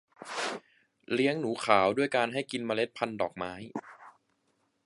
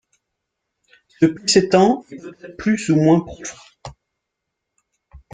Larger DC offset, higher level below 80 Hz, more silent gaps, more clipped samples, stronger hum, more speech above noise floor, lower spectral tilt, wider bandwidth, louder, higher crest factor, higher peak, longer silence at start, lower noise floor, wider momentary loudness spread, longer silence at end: neither; second, -70 dBFS vs -52 dBFS; neither; neither; neither; second, 45 dB vs 62 dB; about the same, -4.5 dB/octave vs -5 dB/octave; first, 11.5 kHz vs 9.6 kHz; second, -30 LUFS vs -17 LUFS; first, 26 dB vs 18 dB; second, -6 dBFS vs -2 dBFS; second, 0.2 s vs 1.2 s; second, -75 dBFS vs -79 dBFS; second, 15 LU vs 24 LU; first, 0.75 s vs 0.15 s